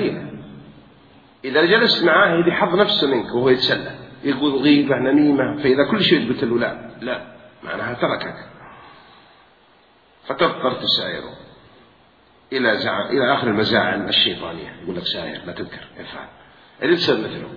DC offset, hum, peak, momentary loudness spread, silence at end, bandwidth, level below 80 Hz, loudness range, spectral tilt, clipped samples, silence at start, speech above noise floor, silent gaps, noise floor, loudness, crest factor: under 0.1%; none; -2 dBFS; 17 LU; 0 s; 5.2 kHz; -56 dBFS; 9 LU; -6.5 dB/octave; under 0.1%; 0 s; 35 dB; none; -54 dBFS; -18 LUFS; 20 dB